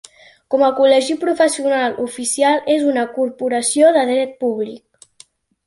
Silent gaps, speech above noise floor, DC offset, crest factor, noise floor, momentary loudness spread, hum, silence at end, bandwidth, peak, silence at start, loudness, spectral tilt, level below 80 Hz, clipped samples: none; 34 dB; under 0.1%; 16 dB; -49 dBFS; 9 LU; none; 0.9 s; 11.5 kHz; -2 dBFS; 0.5 s; -16 LUFS; -2 dB/octave; -64 dBFS; under 0.1%